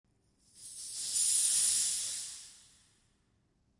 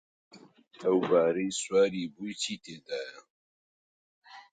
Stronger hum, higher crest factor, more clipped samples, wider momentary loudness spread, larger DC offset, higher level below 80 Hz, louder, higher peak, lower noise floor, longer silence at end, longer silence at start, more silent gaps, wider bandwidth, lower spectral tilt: neither; about the same, 20 dB vs 20 dB; neither; first, 22 LU vs 13 LU; neither; about the same, -74 dBFS vs -74 dBFS; about the same, -29 LUFS vs -29 LUFS; second, -16 dBFS vs -12 dBFS; second, -74 dBFS vs under -90 dBFS; first, 1.25 s vs 0.1 s; first, 0.55 s vs 0.35 s; second, none vs 3.30-4.22 s; first, 12 kHz vs 9.4 kHz; second, 3 dB/octave vs -4 dB/octave